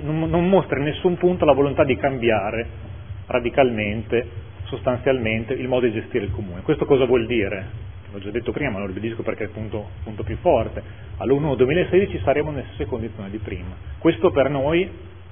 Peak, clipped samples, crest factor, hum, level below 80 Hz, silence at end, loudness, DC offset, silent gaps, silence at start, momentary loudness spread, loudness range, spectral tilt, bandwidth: -2 dBFS; under 0.1%; 20 dB; none; -40 dBFS; 0 s; -22 LUFS; 0.5%; none; 0 s; 15 LU; 5 LU; -11 dB/octave; 3.6 kHz